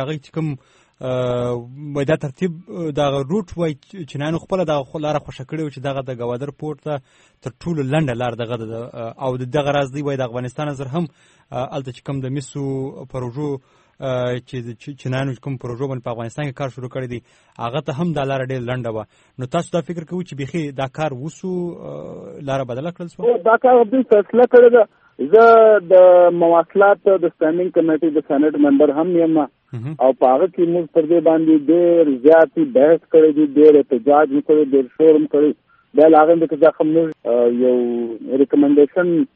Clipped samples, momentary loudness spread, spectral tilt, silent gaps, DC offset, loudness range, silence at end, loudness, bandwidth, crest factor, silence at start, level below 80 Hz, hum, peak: under 0.1%; 17 LU; -8 dB/octave; none; under 0.1%; 13 LU; 0.1 s; -16 LUFS; 8.6 kHz; 16 dB; 0 s; -54 dBFS; none; 0 dBFS